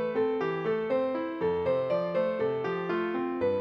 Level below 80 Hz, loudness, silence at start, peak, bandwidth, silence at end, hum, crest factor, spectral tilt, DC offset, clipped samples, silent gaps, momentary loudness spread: -66 dBFS; -29 LUFS; 0 s; -16 dBFS; 6 kHz; 0 s; none; 12 dB; -8.5 dB/octave; under 0.1%; under 0.1%; none; 3 LU